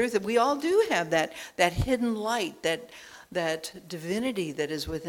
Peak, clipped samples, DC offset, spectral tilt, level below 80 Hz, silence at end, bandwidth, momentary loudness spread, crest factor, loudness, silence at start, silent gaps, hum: -6 dBFS; under 0.1%; under 0.1%; -4.5 dB/octave; -48 dBFS; 0 s; 18.5 kHz; 11 LU; 22 dB; -28 LUFS; 0 s; none; none